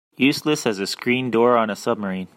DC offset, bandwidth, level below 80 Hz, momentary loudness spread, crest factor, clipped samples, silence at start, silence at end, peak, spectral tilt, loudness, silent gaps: under 0.1%; 16.5 kHz; -66 dBFS; 7 LU; 18 dB; under 0.1%; 0.2 s; 0.1 s; -4 dBFS; -4.5 dB/octave; -20 LUFS; none